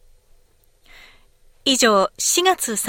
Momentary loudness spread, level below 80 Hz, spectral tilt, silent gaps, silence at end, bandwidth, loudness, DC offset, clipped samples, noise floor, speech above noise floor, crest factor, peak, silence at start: 5 LU; -56 dBFS; -1 dB/octave; none; 0 s; 17 kHz; -17 LUFS; under 0.1%; under 0.1%; -56 dBFS; 38 dB; 18 dB; -4 dBFS; 1.65 s